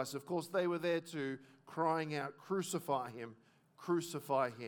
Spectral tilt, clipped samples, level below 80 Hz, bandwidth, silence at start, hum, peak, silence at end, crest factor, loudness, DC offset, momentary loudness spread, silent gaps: -5 dB/octave; under 0.1%; under -90 dBFS; 19 kHz; 0 s; none; -22 dBFS; 0 s; 18 dB; -38 LUFS; under 0.1%; 13 LU; none